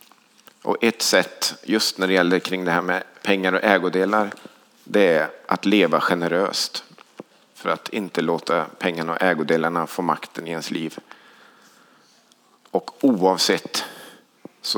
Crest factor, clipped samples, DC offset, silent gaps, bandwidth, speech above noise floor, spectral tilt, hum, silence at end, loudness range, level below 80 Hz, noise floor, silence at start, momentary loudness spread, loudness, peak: 22 dB; under 0.1%; under 0.1%; none; over 20 kHz; 36 dB; -3.5 dB/octave; none; 0 s; 5 LU; -78 dBFS; -57 dBFS; 0.65 s; 11 LU; -21 LUFS; -2 dBFS